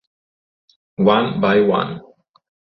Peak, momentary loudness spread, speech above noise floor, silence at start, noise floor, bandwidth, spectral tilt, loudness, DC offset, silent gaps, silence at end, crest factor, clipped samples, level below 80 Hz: -2 dBFS; 17 LU; over 74 dB; 1 s; under -90 dBFS; 6 kHz; -9 dB/octave; -17 LUFS; under 0.1%; none; 0.8 s; 18 dB; under 0.1%; -58 dBFS